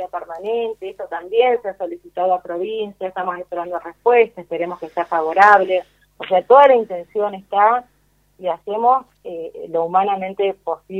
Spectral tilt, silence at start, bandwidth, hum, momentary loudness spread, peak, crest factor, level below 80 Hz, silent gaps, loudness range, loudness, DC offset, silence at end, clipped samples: -5.5 dB/octave; 0 s; 7.6 kHz; 50 Hz at -60 dBFS; 17 LU; 0 dBFS; 18 dB; -62 dBFS; none; 7 LU; -18 LUFS; under 0.1%; 0 s; under 0.1%